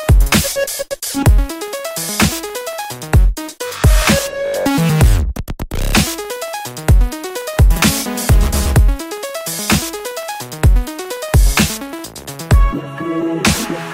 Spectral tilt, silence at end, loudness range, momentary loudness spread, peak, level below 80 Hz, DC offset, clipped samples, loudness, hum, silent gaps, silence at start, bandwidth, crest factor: -4.5 dB/octave; 0 s; 2 LU; 12 LU; 0 dBFS; -16 dBFS; under 0.1%; under 0.1%; -16 LUFS; none; none; 0 s; 16.5 kHz; 14 dB